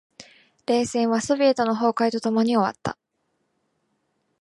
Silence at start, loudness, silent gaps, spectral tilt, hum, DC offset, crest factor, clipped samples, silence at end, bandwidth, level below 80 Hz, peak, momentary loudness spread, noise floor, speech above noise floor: 0.2 s; -22 LUFS; none; -5 dB/octave; none; under 0.1%; 16 dB; under 0.1%; 1.5 s; 11.5 kHz; -62 dBFS; -8 dBFS; 13 LU; -73 dBFS; 52 dB